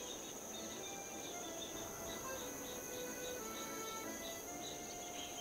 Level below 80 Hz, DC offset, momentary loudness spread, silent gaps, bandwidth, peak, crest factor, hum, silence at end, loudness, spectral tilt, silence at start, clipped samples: -68 dBFS; under 0.1%; 2 LU; none; 16 kHz; -32 dBFS; 14 dB; none; 0 s; -45 LUFS; -2 dB/octave; 0 s; under 0.1%